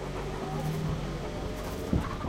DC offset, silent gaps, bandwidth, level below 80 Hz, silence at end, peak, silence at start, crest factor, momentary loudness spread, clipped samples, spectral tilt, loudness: under 0.1%; none; 16 kHz; -40 dBFS; 0 s; -14 dBFS; 0 s; 18 dB; 5 LU; under 0.1%; -6.5 dB/octave; -34 LUFS